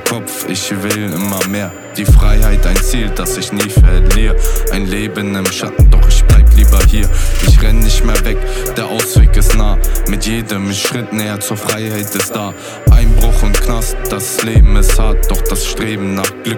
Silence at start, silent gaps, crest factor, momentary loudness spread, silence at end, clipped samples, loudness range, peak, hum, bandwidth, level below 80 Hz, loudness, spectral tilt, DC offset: 0 s; none; 10 dB; 8 LU; 0 s; under 0.1%; 4 LU; 0 dBFS; none; 19.5 kHz; -10 dBFS; -14 LUFS; -4.5 dB/octave; under 0.1%